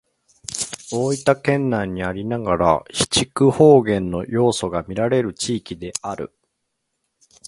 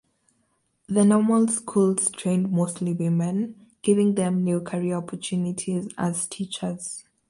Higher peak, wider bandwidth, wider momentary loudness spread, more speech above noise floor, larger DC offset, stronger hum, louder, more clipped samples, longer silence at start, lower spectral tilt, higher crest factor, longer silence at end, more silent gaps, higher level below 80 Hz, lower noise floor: first, 0 dBFS vs -8 dBFS; about the same, 11.5 kHz vs 11.5 kHz; first, 14 LU vs 10 LU; first, 56 dB vs 47 dB; neither; neither; first, -19 LUFS vs -24 LUFS; neither; second, 0.5 s vs 0.9 s; about the same, -5 dB/octave vs -6 dB/octave; about the same, 20 dB vs 16 dB; first, 1.2 s vs 0.3 s; neither; first, -46 dBFS vs -66 dBFS; first, -75 dBFS vs -70 dBFS